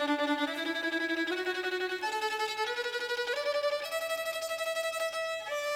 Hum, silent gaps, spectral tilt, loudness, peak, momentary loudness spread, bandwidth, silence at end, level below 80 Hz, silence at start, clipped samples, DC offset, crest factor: none; none; -1 dB/octave; -32 LUFS; -20 dBFS; 3 LU; 17 kHz; 0 s; -74 dBFS; 0 s; under 0.1%; under 0.1%; 14 dB